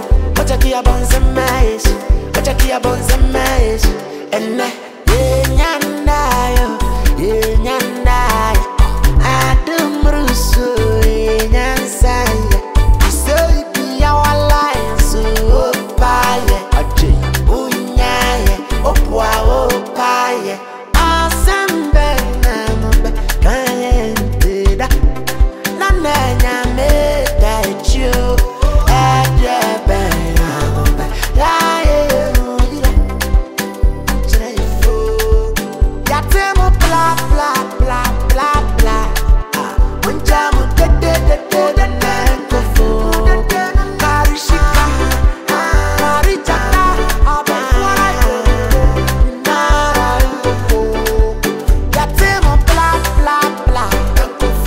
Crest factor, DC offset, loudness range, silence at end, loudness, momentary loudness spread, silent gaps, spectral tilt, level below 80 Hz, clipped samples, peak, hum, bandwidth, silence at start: 12 dB; under 0.1%; 2 LU; 0 s; -14 LUFS; 4 LU; none; -5 dB/octave; -14 dBFS; under 0.1%; 0 dBFS; none; 16.5 kHz; 0 s